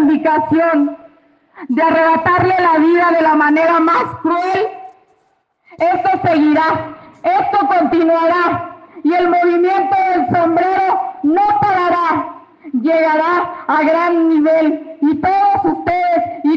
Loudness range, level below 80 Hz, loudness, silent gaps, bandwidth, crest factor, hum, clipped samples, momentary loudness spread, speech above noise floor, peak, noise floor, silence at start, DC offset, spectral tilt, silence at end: 3 LU; -56 dBFS; -14 LUFS; none; 6.6 kHz; 12 dB; none; under 0.1%; 6 LU; 47 dB; -2 dBFS; -60 dBFS; 0 s; under 0.1%; -7.5 dB/octave; 0 s